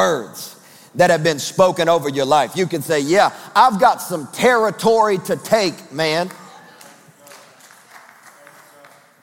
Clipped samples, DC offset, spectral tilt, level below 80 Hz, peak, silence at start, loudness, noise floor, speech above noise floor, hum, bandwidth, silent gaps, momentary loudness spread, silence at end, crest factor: under 0.1%; under 0.1%; -4 dB/octave; -64 dBFS; -2 dBFS; 0 s; -17 LUFS; -47 dBFS; 31 dB; none; 17 kHz; none; 10 LU; 1.25 s; 18 dB